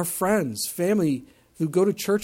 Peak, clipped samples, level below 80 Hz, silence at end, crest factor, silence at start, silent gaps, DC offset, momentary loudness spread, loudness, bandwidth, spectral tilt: -10 dBFS; under 0.1%; -60 dBFS; 0 s; 14 dB; 0 s; none; under 0.1%; 6 LU; -24 LUFS; 17 kHz; -5 dB/octave